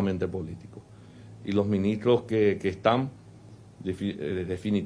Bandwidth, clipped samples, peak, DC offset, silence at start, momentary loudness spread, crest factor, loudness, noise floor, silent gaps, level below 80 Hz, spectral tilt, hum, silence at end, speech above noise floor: 10.5 kHz; under 0.1%; -8 dBFS; under 0.1%; 0 s; 17 LU; 20 dB; -28 LUFS; -49 dBFS; none; -58 dBFS; -8 dB/octave; none; 0 s; 22 dB